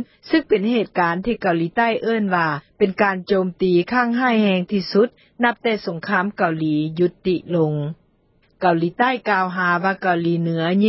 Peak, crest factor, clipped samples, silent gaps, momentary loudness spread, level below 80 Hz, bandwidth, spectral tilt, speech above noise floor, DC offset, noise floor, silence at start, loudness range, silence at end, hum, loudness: -4 dBFS; 16 dB; under 0.1%; none; 4 LU; -56 dBFS; 5.8 kHz; -10.5 dB/octave; 40 dB; under 0.1%; -60 dBFS; 0 s; 2 LU; 0 s; none; -20 LUFS